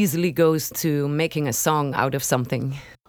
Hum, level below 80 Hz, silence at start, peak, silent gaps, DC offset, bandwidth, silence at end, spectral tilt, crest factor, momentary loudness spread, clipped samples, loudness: none; -56 dBFS; 0 s; -4 dBFS; none; under 0.1%; over 20 kHz; 0.15 s; -5 dB/octave; 18 dB; 5 LU; under 0.1%; -22 LUFS